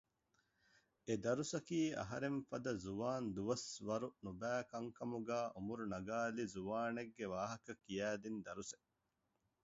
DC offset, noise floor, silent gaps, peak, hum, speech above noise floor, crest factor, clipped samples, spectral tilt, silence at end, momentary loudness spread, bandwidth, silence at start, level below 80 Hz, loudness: under 0.1%; -87 dBFS; none; -26 dBFS; none; 43 dB; 18 dB; under 0.1%; -5 dB/octave; 0.9 s; 8 LU; 7.6 kHz; 1.05 s; -72 dBFS; -44 LUFS